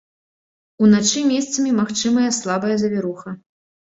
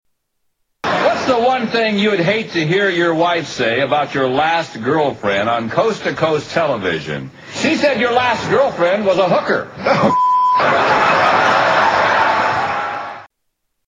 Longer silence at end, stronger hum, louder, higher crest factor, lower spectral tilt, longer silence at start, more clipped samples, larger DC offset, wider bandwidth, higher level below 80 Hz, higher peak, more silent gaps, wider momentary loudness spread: about the same, 0.6 s vs 0.65 s; neither; second, -18 LUFS vs -15 LUFS; about the same, 16 dB vs 14 dB; about the same, -4 dB/octave vs -5 dB/octave; about the same, 0.8 s vs 0.85 s; neither; neither; second, 8 kHz vs 9.8 kHz; second, -60 dBFS vs -54 dBFS; about the same, -4 dBFS vs -2 dBFS; neither; first, 14 LU vs 7 LU